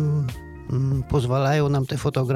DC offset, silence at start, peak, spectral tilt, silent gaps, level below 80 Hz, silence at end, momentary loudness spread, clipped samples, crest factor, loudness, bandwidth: under 0.1%; 0 s; -10 dBFS; -7.5 dB/octave; none; -40 dBFS; 0 s; 9 LU; under 0.1%; 12 dB; -23 LUFS; 14 kHz